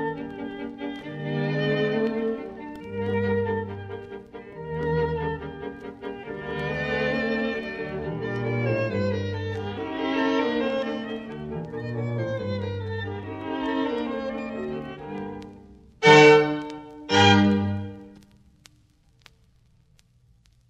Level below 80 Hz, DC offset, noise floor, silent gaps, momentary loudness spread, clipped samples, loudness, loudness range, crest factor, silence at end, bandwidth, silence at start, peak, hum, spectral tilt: -52 dBFS; under 0.1%; -60 dBFS; none; 17 LU; under 0.1%; -25 LUFS; 11 LU; 24 dB; 2.5 s; 8.6 kHz; 0 s; -2 dBFS; none; -5.5 dB/octave